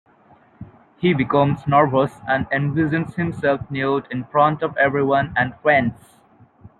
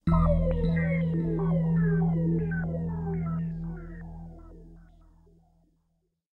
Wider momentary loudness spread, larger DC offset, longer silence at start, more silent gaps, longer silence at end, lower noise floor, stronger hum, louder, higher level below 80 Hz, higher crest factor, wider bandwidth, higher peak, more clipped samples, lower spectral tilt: second, 6 LU vs 18 LU; neither; first, 0.6 s vs 0.05 s; neither; second, 0.85 s vs 1.5 s; second, -53 dBFS vs -75 dBFS; neither; first, -19 LUFS vs -28 LUFS; second, -52 dBFS vs -38 dBFS; about the same, 18 dB vs 16 dB; first, 9.6 kHz vs 4.2 kHz; first, -2 dBFS vs -12 dBFS; neither; second, -8.5 dB/octave vs -11 dB/octave